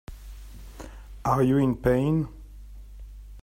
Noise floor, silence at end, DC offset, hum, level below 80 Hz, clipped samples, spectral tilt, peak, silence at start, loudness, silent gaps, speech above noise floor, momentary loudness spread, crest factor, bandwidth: -43 dBFS; 0 s; under 0.1%; none; -42 dBFS; under 0.1%; -8.5 dB/octave; -10 dBFS; 0.1 s; -24 LUFS; none; 21 dB; 25 LU; 18 dB; 16 kHz